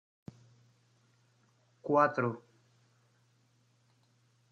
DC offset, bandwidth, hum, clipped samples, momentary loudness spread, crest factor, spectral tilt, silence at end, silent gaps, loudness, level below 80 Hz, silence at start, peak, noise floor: under 0.1%; 7.4 kHz; none; under 0.1%; 27 LU; 26 dB; -8 dB/octave; 2.1 s; none; -30 LUFS; -82 dBFS; 1.85 s; -12 dBFS; -70 dBFS